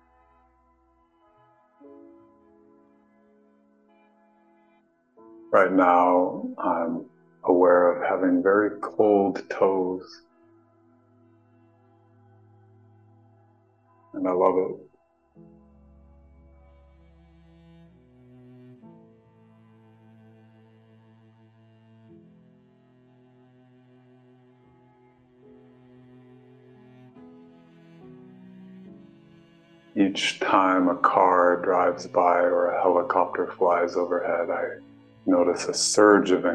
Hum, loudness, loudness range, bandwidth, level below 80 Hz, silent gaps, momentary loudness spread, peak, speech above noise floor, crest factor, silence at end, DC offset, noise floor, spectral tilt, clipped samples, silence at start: none; -22 LUFS; 10 LU; 12 kHz; -68 dBFS; none; 13 LU; -4 dBFS; 43 dB; 22 dB; 0 s; under 0.1%; -64 dBFS; -4 dB/octave; under 0.1%; 5.5 s